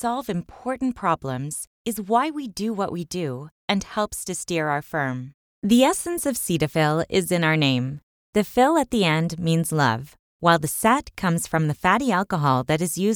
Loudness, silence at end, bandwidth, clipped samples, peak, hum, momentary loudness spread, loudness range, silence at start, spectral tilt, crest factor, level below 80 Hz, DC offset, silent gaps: -23 LUFS; 0 s; over 20 kHz; under 0.1%; -2 dBFS; none; 11 LU; 5 LU; 0 s; -5 dB/octave; 20 dB; -52 dBFS; under 0.1%; 1.67-1.85 s, 3.52-3.68 s, 5.34-5.62 s, 8.03-8.33 s, 10.19-10.39 s